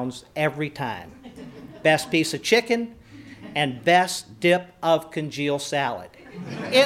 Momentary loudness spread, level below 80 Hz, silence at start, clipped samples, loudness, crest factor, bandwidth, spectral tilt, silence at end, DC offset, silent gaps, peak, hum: 21 LU; -62 dBFS; 0 s; under 0.1%; -23 LUFS; 20 dB; 16.5 kHz; -4 dB/octave; 0 s; under 0.1%; none; -4 dBFS; none